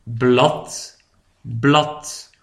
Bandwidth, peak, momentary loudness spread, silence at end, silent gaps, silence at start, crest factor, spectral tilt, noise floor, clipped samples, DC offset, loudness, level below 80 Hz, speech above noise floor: 14.5 kHz; 0 dBFS; 17 LU; 0.2 s; none; 0.05 s; 18 dB; -5 dB/octave; -59 dBFS; under 0.1%; under 0.1%; -17 LUFS; -54 dBFS; 41 dB